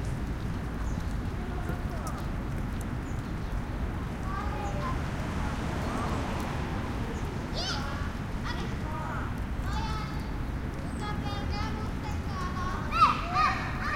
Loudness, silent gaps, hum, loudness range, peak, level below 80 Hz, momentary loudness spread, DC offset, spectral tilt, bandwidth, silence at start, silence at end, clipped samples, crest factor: -32 LUFS; none; none; 4 LU; -10 dBFS; -36 dBFS; 8 LU; under 0.1%; -6 dB/octave; 16.5 kHz; 0 s; 0 s; under 0.1%; 22 dB